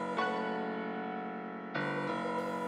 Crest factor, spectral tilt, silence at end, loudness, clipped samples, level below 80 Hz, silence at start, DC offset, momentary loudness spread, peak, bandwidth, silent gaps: 16 dB; -6 dB/octave; 0 s; -36 LUFS; under 0.1%; -80 dBFS; 0 s; under 0.1%; 6 LU; -20 dBFS; 12.5 kHz; none